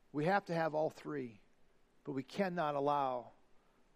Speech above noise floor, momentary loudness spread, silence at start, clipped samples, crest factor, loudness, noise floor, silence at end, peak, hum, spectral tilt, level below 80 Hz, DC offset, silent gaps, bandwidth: 31 dB; 10 LU; 0.15 s; under 0.1%; 20 dB; -38 LUFS; -68 dBFS; 0.4 s; -18 dBFS; none; -7 dB/octave; -76 dBFS; under 0.1%; none; 15 kHz